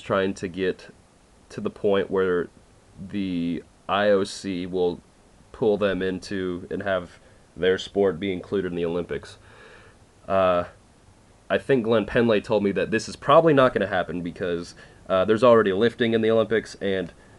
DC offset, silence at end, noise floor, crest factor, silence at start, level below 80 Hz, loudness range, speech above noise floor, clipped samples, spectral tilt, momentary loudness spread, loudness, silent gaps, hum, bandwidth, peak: under 0.1%; 0.3 s; -55 dBFS; 20 dB; 0 s; -54 dBFS; 7 LU; 32 dB; under 0.1%; -6 dB/octave; 13 LU; -23 LUFS; none; none; 11.5 kHz; -4 dBFS